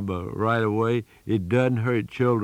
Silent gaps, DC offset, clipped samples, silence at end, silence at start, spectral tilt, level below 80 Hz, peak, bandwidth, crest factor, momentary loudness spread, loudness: none; under 0.1%; under 0.1%; 0 s; 0 s; -8.5 dB/octave; -58 dBFS; -10 dBFS; 10 kHz; 14 dB; 6 LU; -24 LUFS